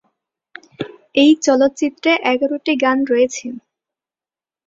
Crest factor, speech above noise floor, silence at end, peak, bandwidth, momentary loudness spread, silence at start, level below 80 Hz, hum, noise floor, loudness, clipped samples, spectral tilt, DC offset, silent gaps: 16 dB; over 75 dB; 1.1 s; -2 dBFS; 7.8 kHz; 18 LU; 0.8 s; -62 dBFS; none; under -90 dBFS; -16 LUFS; under 0.1%; -3 dB/octave; under 0.1%; none